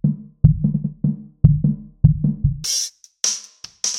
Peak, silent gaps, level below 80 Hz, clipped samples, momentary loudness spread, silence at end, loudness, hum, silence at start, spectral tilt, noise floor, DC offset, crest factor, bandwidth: 0 dBFS; none; -30 dBFS; under 0.1%; 8 LU; 0 s; -20 LUFS; none; 0.05 s; -5 dB/octave; -37 dBFS; under 0.1%; 20 dB; 14.5 kHz